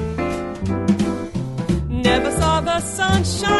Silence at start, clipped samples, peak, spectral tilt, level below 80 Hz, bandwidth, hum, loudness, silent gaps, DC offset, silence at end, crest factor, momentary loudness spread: 0 s; under 0.1%; -4 dBFS; -5 dB/octave; -32 dBFS; 12 kHz; none; -20 LUFS; none; under 0.1%; 0 s; 16 dB; 7 LU